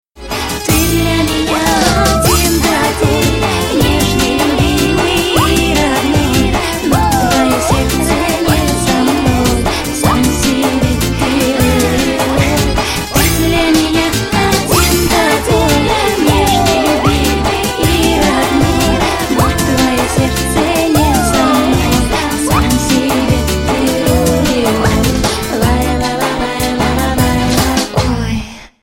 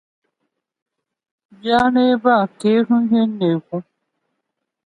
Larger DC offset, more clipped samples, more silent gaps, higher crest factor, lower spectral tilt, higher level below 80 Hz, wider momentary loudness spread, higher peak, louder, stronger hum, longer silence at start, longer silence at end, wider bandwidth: neither; neither; neither; about the same, 12 dB vs 16 dB; second, -4.5 dB/octave vs -7 dB/octave; first, -22 dBFS vs -56 dBFS; second, 4 LU vs 12 LU; first, 0 dBFS vs -4 dBFS; first, -12 LUFS vs -17 LUFS; neither; second, 0.15 s vs 1.65 s; second, 0.15 s vs 1.05 s; first, 17 kHz vs 10.5 kHz